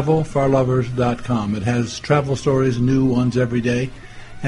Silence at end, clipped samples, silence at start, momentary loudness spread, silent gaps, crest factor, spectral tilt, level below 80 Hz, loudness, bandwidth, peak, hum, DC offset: 0 s; under 0.1%; 0 s; 5 LU; none; 16 dB; -7 dB/octave; -40 dBFS; -19 LUFS; 11 kHz; -4 dBFS; none; under 0.1%